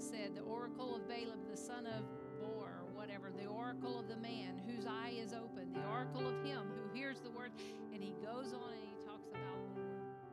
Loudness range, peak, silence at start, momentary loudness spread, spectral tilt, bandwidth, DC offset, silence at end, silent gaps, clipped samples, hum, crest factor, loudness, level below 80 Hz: 3 LU; -30 dBFS; 0 s; 6 LU; -5.5 dB/octave; 13 kHz; under 0.1%; 0 s; none; under 0.1%; none; 16 dB; -47 LUFS; -84 dBFS